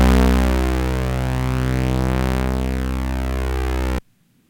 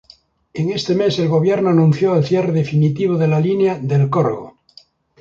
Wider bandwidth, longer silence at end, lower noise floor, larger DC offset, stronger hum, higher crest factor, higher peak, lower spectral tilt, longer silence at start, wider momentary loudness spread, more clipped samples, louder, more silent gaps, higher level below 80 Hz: first, 17 kHz vs 7.4 kHz; second, 0.5 s vs 0.7 s; first, -54 dBFS vs -50 dBFS; neither; neither; about the same, 16 dB vs 14 dB; about the same, -4 dBFS vs -2 dBFS; second, -6.5 dB/octave vs -8 dB/octave; second, 0 s vs 0.55 s; about the same, 7 LU vs 7 LU; neither; second, -21 LUFS vs -16 LUFS; neither; first, -22 dBFS vs -54 dBFS